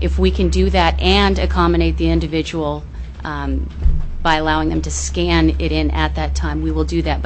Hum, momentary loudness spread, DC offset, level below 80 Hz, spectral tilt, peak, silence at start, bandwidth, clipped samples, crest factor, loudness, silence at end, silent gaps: none; 8 LU; under 0.1%; -20 dBFS; -5.5 dB/octave; -2 dBFS; 0 s; 8.6 kHz; under 0.1%; 14 dB; -17 LUFS; 0 s; none